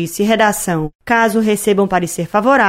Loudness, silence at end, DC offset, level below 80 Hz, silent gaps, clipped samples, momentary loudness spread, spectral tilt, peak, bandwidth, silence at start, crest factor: -15 LUFS; 0 s; under 0.1%; -44 dBFS; 0.95-0.99 s; under 0.1%; 5 LU; -4.5 dB/octave; -2 dBFS; 16.5 kHz; 0 s; 12 dB